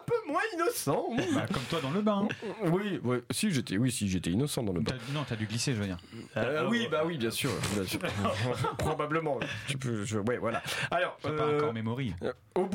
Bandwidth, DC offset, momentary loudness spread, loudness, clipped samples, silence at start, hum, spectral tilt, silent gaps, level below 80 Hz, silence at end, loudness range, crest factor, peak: 16.5 kHz; under 0.1%; 5 LU; -31 LUFS; under 0.1%; 0 s; none; -5 dB/octave; none; -58 dBFS; 0 s; 1 LU; 14 dB; -18 dBFS